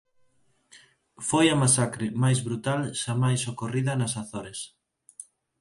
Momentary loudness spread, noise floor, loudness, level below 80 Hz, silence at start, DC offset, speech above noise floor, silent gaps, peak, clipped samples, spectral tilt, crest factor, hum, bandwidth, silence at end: 17 LU; -65 dBFS; -25 LUFS; -62 dBFS; 0.75 s; under 0.1%; 40 dB; none; -6 dBFS; under 0.1%; -4.5 dB/octave; 20 dB; none; 11.5 kHz; 0.4 s